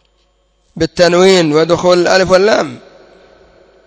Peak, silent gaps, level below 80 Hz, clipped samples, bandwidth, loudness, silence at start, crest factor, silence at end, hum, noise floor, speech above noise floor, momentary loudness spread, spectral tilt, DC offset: 0 dBFS; none; -44 dBFS; 0.3%; 8 kHz; -10 LUFS; 0.75 s; 12 dB; 1.1 s; none; -57 dBFS; 47 dB; 10 LU; -4.5 dB/octave; under 0.1%